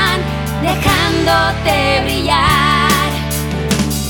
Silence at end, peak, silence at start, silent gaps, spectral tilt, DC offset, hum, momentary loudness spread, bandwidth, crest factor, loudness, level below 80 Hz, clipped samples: 0 s; -2 dBFS; 0 s; none; -4 dB/octave; under 0.1%; none; 7 LU; over 20 kHz; 12 dB; -14 LUFS; -26 dBFS; under 0.1%